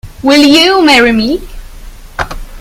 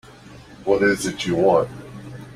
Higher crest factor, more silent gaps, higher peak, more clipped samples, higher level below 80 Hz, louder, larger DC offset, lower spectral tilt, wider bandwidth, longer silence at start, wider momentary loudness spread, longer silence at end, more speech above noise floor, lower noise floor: second, 10 dB vs 18 dB; neither; first, 0 dBFS vs -4 dBFS; first, 0.9% vs under 0.1%; first, -28 dBFS vs -52 dBFS; first, -7 LUFS vs -20 LUFS; neither; second, -3.5 dB/octave vs -5 dB/octave; about the same, 16.5 kHz vs 15 kHz; second, 0.05 s vs 0.25 s; second, 16 LU vs 20 LU; about the same, 0 s vs 0 s; about the same, 22 dB vs 25 dB; second, -29 dBFS vs -43 dBFS